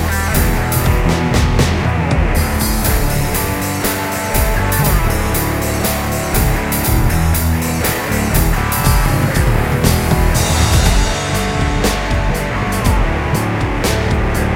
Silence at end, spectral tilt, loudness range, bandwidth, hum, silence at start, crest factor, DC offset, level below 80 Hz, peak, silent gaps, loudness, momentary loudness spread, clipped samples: 0 s; -5 dB/octave; 2 LU; 17 kHz; none; 0 s; 14 dB; under 0.1%; -18 dBFS; 0 dBFS; none; -15 LUFS; 3 LU; under 0.1%